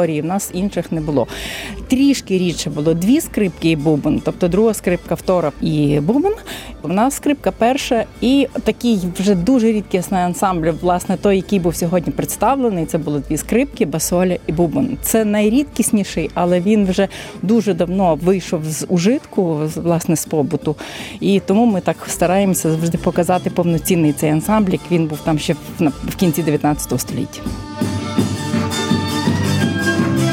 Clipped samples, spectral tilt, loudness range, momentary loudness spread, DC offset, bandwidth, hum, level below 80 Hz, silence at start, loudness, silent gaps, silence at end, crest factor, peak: under 0.1%; -5.5 dB/octave; 2 LU; 6 LU; under 0.1%; 17 kHz; none; -38 dBFS; 0 s; -17 LUFS; none; 0 s; 14 dB; -2 dBFS